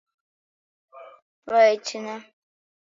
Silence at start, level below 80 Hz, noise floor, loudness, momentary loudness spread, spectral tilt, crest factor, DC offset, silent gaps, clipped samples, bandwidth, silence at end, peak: 0.95 s; -80 dBFS; under -90 dBFS; -21 LUFS; 18 LU; -2.5 dB/octave; 20 dB; under 0.1%; 1.22-1.43 s; under 0.1%; 7.6 kHz; 0.75 s; -6 dBFS